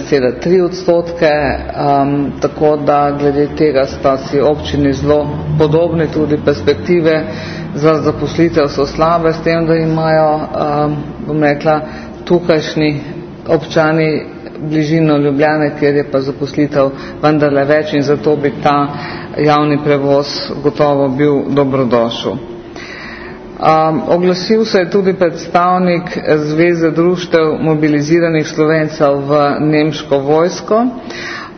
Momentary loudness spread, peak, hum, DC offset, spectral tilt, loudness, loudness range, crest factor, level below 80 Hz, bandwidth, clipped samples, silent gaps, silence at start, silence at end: 7 LU; 0 dBFS; none; under 0.1%; -7 dB/octave; -13 LUFS; 2 LU; 12 dB; -40 dBFS; 6.6 kHz; under 0.1%; none; 0 s; 0.05 s